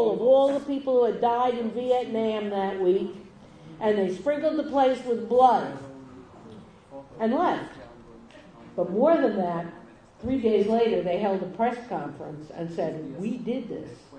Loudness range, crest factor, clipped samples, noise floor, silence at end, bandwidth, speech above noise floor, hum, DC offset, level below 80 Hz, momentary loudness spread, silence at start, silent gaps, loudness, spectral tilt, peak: 4 LU; 20 dB; under 0.1%; -48 dBFS; 0 s; 9.6 kHz; 24 dB; none; under 0.1%; -60 dBFS; 18 LU; 0 s; none; -25 LUFS; -7 dB/octave; -6 dBFS